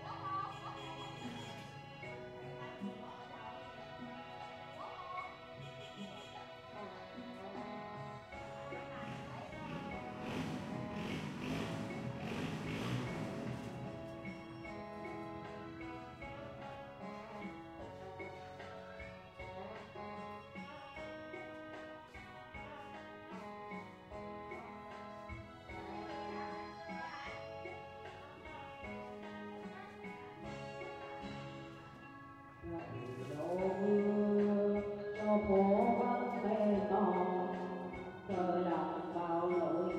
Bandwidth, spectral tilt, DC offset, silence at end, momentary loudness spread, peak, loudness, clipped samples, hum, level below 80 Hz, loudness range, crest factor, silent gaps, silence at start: 12 kHz; -7 dB/octave; under 0.1%; 0 s; 16 LU; -20 dBFS; -42 LUFS; under 0.1%; none; -66 dBFS; 15 LU; 20 dB; none; 0 s